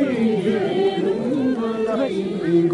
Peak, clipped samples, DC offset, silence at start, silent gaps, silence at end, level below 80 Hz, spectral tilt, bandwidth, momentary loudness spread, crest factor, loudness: -8 dBFS; under 0.1%; under 0.1%; 0 s; none; 0 s; -58 dBFS; -7.5 dB/octave; 11 kHz; 3 LU; 12 dB; -21 LUFS